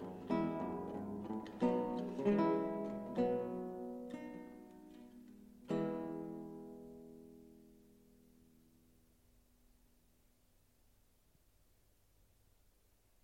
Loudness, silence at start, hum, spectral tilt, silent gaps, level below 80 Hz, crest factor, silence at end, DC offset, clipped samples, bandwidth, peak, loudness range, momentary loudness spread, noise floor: -40 LUFS; 0 s; none; -8.5 dB/octave; none; -70 dBFS; 20 dB; 5.45 s; under 0.1%; under 0.1%; 16.5 kHz; -22 dBFS; 16 LU; 22 LU; -73 dBFS